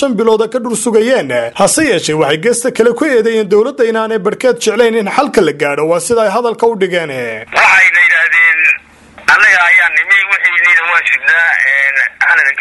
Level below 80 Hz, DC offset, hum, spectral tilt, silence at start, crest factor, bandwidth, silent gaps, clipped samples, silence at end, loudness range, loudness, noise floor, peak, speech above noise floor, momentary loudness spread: -50 dBFS; under 0.1%; none; -3 dB/octave; 0 s; 10 dB; 12 kHz; none; 0.1%; 0 s; 5 LU; -9 LUFS; -37 dBFS; 0 dBFS; 27 dB; 8 LU